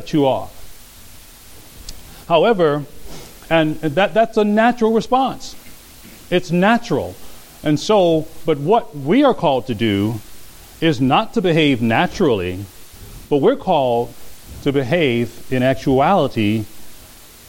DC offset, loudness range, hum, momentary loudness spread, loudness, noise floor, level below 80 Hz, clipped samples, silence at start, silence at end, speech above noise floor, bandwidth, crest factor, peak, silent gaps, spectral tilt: under 0.1%; 3 LU; none; 20 LU; -17 LUFS; -41 dBFS; -44 dBFS; under 0.1%; 0 s; 0.2 s; 25 dB; 17 kHz; 18 dB; 0 dBFS; none; -6 dB/octave